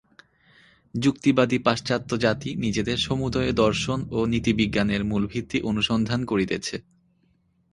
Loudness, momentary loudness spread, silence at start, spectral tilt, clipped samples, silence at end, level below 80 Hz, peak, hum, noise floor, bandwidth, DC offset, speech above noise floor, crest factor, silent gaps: -24 LUFS; 6 LU; 0.95 s; -5.5 dB/octave; under 0.1%; 0.95 s; -46 dBFS; -4 dBFS; none; -65 dBFS; 11.5 kHz; under 0.1%; 42 dB; 20 dB; none